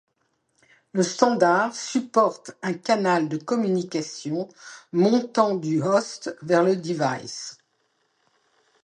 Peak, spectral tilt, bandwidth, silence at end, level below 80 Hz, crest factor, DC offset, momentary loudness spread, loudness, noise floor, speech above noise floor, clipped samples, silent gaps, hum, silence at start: -2 dBFS; -5 dB/octave; 10.5 kHz; 1.3 s; -74 dBFS; 22 dB; under 0.1%; 12 LU; -23 LUFS; -72 dBFS; 49 dB; under 0.1%; none; none; 0.95 s